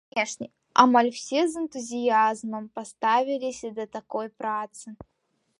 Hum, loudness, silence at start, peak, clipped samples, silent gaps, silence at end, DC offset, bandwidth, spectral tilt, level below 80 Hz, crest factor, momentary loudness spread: none; -25 LUFS; 0.15 s; -2 dBFS; under 0.1%; none; 0.65 s; under 0.1%; 11.5 kHz; -3 dB/octave; -68 dBFS; 24 dB; 16 LU